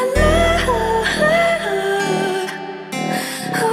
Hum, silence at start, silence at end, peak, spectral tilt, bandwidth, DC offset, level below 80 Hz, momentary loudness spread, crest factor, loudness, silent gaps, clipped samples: none; 0 s; 0 s; -2 dBFS; -4.5 dB/octave; 16 kHz; under 0.1%; -30 dBFS; 10 LU; 16 dB; -18 LUFS; none; under 0.1%